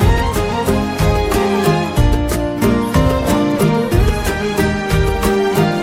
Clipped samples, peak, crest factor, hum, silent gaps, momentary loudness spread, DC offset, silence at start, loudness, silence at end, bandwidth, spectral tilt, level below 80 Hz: under 0.1%; -2 dBFS; 12 dB; none; none; 3 LU; under 0.1%; 0 s; -15 LUFS; 0 s; 17 kHz; -6 dB/octave; -22 dBFS